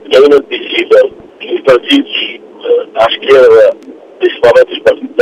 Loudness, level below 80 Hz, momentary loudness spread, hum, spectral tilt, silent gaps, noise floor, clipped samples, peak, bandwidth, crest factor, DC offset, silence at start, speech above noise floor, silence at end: -8 LUFS; -48 dBFS; 11 LU; none; -4 dB/octave; none; -31 dBFS; 0.5%; 0 dBFS; 10.5 kHz; 8 dB; under 0.1%; 0.05 s; 25 dB; 0 s